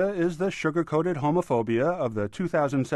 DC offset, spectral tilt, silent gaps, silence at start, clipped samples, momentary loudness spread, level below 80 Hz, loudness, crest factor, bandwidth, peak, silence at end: under 0.1%; -7 dB/octave; none; 0 s; under 0.1%; 3 LU; -58 dBFS; -26 LUFS; 12 dB; 12 kHz; -12 dBFS; 0 s